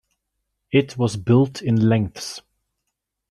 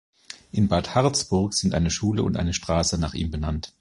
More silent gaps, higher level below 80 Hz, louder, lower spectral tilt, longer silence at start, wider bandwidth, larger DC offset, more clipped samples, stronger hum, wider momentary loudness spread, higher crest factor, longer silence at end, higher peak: neither; second, -56 dBFS vs -36 dBFS; first, -20 LUFS vs -24 LUFS; first, -7 dB/octave vs -5 dB/octave; first, 0.7 s vs 0.3 s; about the same, 12.5 kHz vs 11.5 kHz; neither; neither; neither; first, 14 LU vs 8 LU; about the same, 18 dB vs 18 dB; first, 0.9 s vs 0.1 s; about the same, -4 dBFS vs -6 dBFS